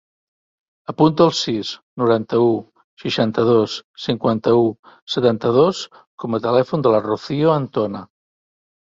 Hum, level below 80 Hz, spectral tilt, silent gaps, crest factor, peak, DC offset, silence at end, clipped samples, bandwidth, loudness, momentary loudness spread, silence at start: none; -58 dBFS; -6.5 dB/octave; 1.83-1.97 s, 2.84-2.97 s, 3.84-3.94 s, 4.79-4.83 s, 5.02-5.07 s, 6.07-6.18 s; 18 dB; -2 dBFS; under 0.1%; 0.85 s; under 0.1%; 7.8 kHz; -18 LUFS; 13 LU; 0.9 s